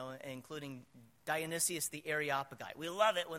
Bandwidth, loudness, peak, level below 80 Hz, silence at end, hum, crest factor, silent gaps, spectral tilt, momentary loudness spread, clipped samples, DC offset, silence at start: 16 kHz; -37 LUFS; -18 dBFS; -78 dBFS; 0 s; none; 20 dB; none; -2.5 dB/octave; 15 LU; under 0.1%; under 0.1%; 0 s